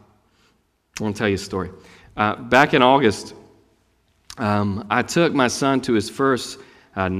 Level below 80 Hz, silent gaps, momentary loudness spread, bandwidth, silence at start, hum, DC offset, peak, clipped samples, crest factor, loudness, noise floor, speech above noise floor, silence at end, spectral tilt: -54 dBFS; none; 18 LU; 15.5 kHz; 0.95 s; none; under 0.1%; 0 dBFS; under 0.1%; 22 dB; -20 LUFS; -63 dBFS; 44 dB; 0 s; -5 dB/octave